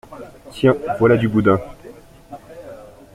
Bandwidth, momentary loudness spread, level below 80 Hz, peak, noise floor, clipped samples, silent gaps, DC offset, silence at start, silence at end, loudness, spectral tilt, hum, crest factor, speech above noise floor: 14.5 kHz; 23 LU; -48 dBFS; -2 dBFS; -41 dBFS; under 0.1%; none; under 0.1%; 0.1 s; 0.3 s; -17 LUFS; -8 dB/octave; none; 18 dB; 25 dB